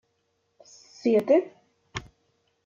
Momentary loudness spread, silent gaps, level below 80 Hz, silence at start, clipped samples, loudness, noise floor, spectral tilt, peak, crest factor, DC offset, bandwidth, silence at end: 18 LU; none; -62 dBFS; 1.05 s; under 0.1%; -24 LUFS; -74 dBFS; -6 dB/octave; -10 dBFS; 20 dB; under 0.1%; 12 kHz; 0.65 s